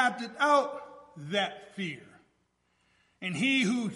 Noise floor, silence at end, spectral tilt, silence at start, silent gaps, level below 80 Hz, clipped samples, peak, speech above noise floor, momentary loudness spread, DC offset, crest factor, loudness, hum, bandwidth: -74 dBFS; 0 s; -4.5 dB/octave; 0 s; none; -78 dBFS; under 0.1%; -12 dBFS; 44 dB; 20 LU; under 0.1%; 20 dB; -29 LUFS; none; 11.5 kHz